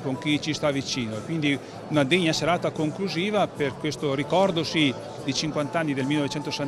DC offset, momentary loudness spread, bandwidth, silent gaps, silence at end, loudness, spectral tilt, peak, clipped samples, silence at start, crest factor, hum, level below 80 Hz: under 0.1%; 6 LU; 13.5 kHz; none; 0 s; -25 LUFS; -5 dB/octave; -6 dBFS; under 0.1%; 0 s; 20 dB; none; -58 dBFS